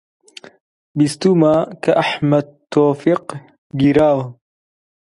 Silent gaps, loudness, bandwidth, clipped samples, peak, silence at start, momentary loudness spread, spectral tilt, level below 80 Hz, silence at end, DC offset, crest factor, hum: 3.58-3.70 s; -16 LUFS; 11.5 kHz; under 0.1%; 0 dBFS; 0.95 s; 16 LU; -7 dB/octave; -52 dBFS; 0.7 s; under 0.1%; 16 dB; none